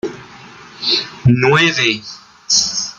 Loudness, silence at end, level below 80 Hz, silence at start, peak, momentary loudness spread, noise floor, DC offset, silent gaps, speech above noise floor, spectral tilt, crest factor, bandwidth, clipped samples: -14 LUFS; 0.05 s; -48 dBFS; 0.05 s; 0 dBFS; 20 LU; -38 dBFS; under 0.1%; none; 24 dB; -3.5 dB/octave; 16 dB; 9.4 kHz; under 0.1%